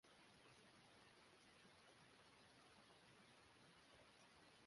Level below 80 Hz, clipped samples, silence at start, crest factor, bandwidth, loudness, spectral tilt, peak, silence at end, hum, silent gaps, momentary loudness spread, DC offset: -90 dBFS; under 0.1%; 0.05 s; 16 dB; 11.5 kHz; -69 LUFS; -3 dB/octave; -54 dBFS; 0 s; none; none; 1 LU; under 0.1%